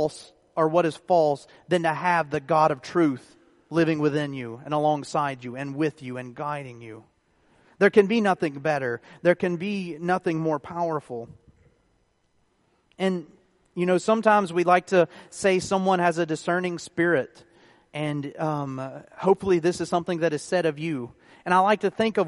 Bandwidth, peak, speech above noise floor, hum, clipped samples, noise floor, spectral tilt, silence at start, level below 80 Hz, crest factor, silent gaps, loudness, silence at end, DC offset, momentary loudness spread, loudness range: 11.5 kHz; -4 dBFS; 43 dB; none; under 0.1%; -68 dBFS; -6 dB/octave; 0 s; -64 dBFS; 20 dB; none; -24 LUFS; 0 s; under 0.1%; 13 LU; 7 LU